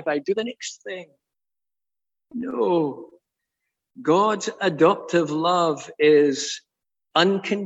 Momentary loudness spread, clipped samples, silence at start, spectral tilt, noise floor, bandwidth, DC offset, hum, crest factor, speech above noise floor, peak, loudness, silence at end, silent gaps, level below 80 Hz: 16 LU; under 0.1%; 0 s; -4.5 dB/octave; under -90 dBFS; 8.2 kHz; under 0.1%; none; 18 dB; over 68 dB; -4 dBFS; -22 LUFS; 0 s; none; -74 dBFS